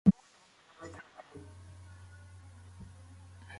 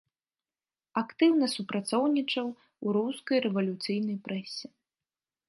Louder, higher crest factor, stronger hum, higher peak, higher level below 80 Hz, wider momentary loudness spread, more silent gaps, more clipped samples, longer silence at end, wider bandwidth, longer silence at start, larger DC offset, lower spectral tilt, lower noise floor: second, -40 LUFS vs -29 LUFS; first, 26 dB vs 18 dB; neither; first, -10 dBFS vs -14 dBFS; first, -58 dBFS vs -80 dBFS; second, 8 LU vs 12 LU; neither; neither; first, 2.75 s vs 0.8 s; about the same, 11 kHz vs 11.5 kHz; second, 0.05 s vs 0.95 s; neither; first, -8.5 dB/octave vs -5 dB/octave; second, -63 dBFS vs under -90 dBFS